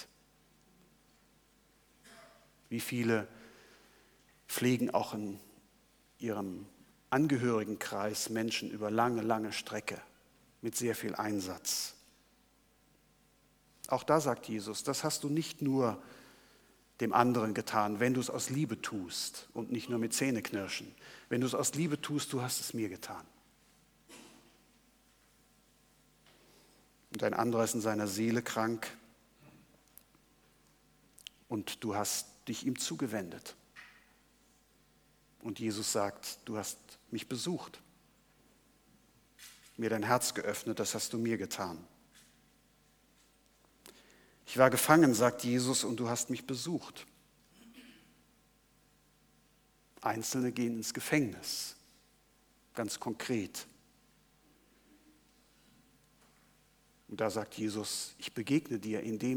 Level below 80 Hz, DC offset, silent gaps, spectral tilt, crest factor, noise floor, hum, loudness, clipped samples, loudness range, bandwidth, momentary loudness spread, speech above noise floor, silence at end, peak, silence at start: -74 dBFS; under 0.1%; none; -4 dB/octave; 28 dB; -68 dBFS; none; -34 LUFS; under 0.1%; 11 LU; over 20 kHz; 19 LU; 35 dB; 0 s; -8 dBFS; 0 s